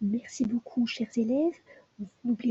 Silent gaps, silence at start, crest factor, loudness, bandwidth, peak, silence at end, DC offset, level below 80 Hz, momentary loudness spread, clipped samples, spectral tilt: none; 0 s; 14 dB; -30 LUFS; 8 kHz; -16 dBFS; 0 s; under 0.1%; -68 dBFS; 10 LU; under 0.1%; -6 dB/octave